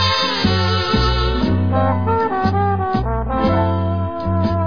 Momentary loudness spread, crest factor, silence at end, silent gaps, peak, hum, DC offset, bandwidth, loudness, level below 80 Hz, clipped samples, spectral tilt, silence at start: 4 LU; 14 dB; 0 s; none; -2 dBFS; none; 1%; 5.4 kHz; -18 LUFS; -28 dBFS; under 0.1%; -6.5 dB/octave; 0 s